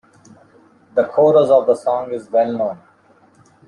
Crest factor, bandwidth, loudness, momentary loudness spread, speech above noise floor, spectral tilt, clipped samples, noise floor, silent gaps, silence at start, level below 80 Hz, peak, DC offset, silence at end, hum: 16 dB; 10.5 kHz; -16 LUFS; 11 LU; 37 dB; -7 dB/octave; under 0.1%; -52 dBFS; none; 0.95 s; -66 dBFS; -2 dBFS; under 0.1%; 0.9 s; none